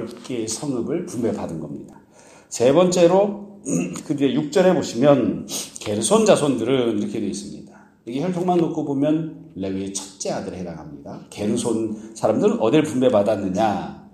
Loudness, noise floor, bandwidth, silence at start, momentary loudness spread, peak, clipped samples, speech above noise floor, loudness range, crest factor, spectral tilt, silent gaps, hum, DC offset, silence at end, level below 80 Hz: -21 LUFS; -49 dBFS; 15.5 kHz; 0 s; 16 LU; 0 dBFS; under 0.1%; 28 dB; 6 LU; 20 dB; -5.5 dB/octave; none; none; under 0.1%; 0.05 s; -58 dBFS